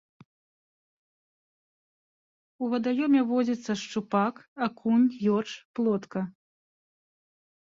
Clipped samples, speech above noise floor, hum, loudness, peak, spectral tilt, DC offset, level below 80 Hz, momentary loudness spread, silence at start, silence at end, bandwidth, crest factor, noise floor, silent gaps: under 0.1%; over 63 dB; none; -27 LUFS; -12 dBFS; -6.5 dB/octave; under 0.1%; -74 dBFS; 11 LU; 2.6 s; 1.45 s; 7.6 kHz; 18 dB; under -90 dBFS; 4.48-4.56 s, 5.65-5.74 s